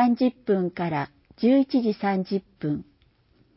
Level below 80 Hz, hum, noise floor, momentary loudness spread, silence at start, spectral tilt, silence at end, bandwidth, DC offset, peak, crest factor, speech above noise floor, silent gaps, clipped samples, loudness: -62 dBFS; none; -62 dBFS; 10 LU; 0 s; -11.5 dB/octave; 0.75 s; 5.8 kHz; under 0.1%; -10 dBFS; 14 dB; 38 dB; none; under 0.1%; -25 LUFS